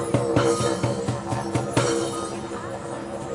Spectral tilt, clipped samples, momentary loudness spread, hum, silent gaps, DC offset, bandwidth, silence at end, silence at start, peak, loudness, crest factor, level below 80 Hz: -5.5 dB/octave; under 0.1%; 11 LU; none; none; under 0.1%; 11.5 kHz; 0 s; 0 s; -6 dBFS; -25 LUFS; 20 dB; -52 dBFS